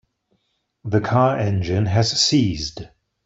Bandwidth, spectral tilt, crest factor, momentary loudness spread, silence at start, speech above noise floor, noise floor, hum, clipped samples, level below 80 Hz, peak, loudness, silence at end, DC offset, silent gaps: 8 kHz; -5 dB/octave; 18 dB; 13 LU; 0.85 s; 51 dB; -70 dBFS; none; under 0.1%; -46 dBFS; -4 dBFS; -19 LUFS; 0.4 s; under 0.1%; none